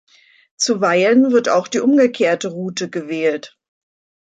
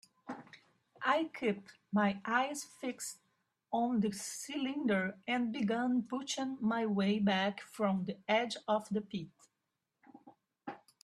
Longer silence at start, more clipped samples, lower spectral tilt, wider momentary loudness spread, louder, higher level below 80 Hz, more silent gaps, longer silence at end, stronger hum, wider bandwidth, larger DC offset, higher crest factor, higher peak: first, 0.6 s vs 0.25 s; neither; about the same, -4 dB/octave vs -4.5 dB/octave; second, 11 LU vs 16 LU; first, -16 LUFS vs -35 LUFS; first, -68 dBFS vs -78 dBFS; neither; first, 0.75 s vs 0.25 s; neither; second, 9.2 kHz vs 13.5 kHz; neither; second, 14 dB vs 20 dB; first, -4 dBFS vs -16 dBFS